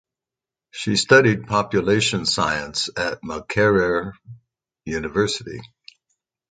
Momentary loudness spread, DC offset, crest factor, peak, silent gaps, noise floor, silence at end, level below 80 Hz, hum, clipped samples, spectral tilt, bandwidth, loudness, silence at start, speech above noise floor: 18 LU; under 0.1%; 22 dB; 0 dBFS; none; -89 dBFS; 0.85 s; -50 dBFS; none; under 0.1%; -4 dB/octave; 9.4 kHz; -20 LUFS; 0.75 s; 68 dB